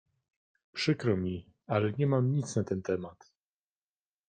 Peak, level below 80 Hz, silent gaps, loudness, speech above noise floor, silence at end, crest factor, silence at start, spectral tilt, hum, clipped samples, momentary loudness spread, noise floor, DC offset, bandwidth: -14 dBFS; -68 dBFS; none; -31 LUFS; over 60 dB; 1.15 s; 18 dB; 0.75 s; -6.5 dB/octave; none; under 0.1%; 11 LU; under -90 dBFS; under 0.1%; 9.4 kHz